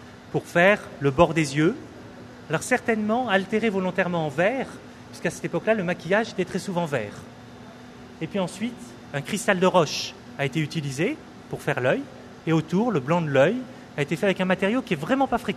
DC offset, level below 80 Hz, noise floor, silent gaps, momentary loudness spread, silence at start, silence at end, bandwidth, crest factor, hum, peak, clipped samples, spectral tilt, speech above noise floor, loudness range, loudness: under 0.1%; -56 dBFS; -43 dBFS; none; 20 LU; 0 s; 0 s; 13.5 kHz; 22 dB; none; -2 dBFS; under 0.1%; -5.5 dB/octave; 20 dB; 4 LU; -24 LUFS